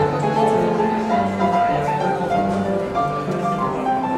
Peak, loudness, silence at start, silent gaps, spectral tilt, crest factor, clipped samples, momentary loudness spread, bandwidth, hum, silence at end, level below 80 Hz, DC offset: -4 dBFS; -20 LUFS; 0 s; none; -7 dB/octave; 14 dB; under 0.1%; 4 LU; 13 kHz; none; 0 s; -48 dBFS; under 0.1%